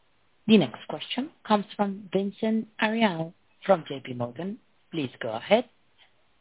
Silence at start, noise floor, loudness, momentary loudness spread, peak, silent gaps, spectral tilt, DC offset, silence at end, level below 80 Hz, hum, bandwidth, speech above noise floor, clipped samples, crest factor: 0.45 s; -63 dBFS; -27 LUFS; 15 LU; -6 dBFS; none; -4 dB/octave; under 0.1%; 0.8 s; -72 dBFS; none; 4 kHz; 37 dB; under 0.1%; 20 dB